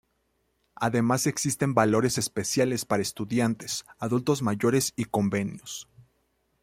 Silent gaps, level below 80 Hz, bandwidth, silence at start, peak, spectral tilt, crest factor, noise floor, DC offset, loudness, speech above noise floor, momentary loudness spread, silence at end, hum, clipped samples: none; -62 dBFS; 16.5 kHz; 0.8 s; -6 dBFS; -4.5 dB/octave; 20 dB; -73 dBFS; under 0.1%; -26 LUFS; 47 dB; 8 LU; 0.6 s; none; under 0.1%